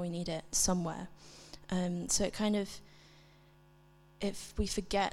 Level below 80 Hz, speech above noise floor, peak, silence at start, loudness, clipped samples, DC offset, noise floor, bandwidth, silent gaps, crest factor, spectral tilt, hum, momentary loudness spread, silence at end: -50 dBFS; 27 dB; -16 dBFS; 0 s; -34 LUFS; under 0.1%; under 0.1%; -62 dBFS; 16.5 kHz; none; 20 dB; -3.5 dB/octave; none; 19 LU; 0 s